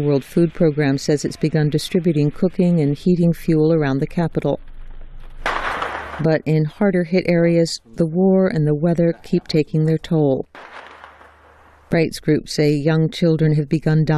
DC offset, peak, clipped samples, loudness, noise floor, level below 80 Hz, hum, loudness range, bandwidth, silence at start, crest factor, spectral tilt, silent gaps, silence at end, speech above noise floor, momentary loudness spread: under 0.1%; -4 dBFS; under 0.1%; -18 LUFS; -48 dBFS; -40 dBFS; none; 4 LU; 13 kHz; 0 s; 14 dB; -7.5 dB/octave; none; 0 s; 31 dB; 7 LU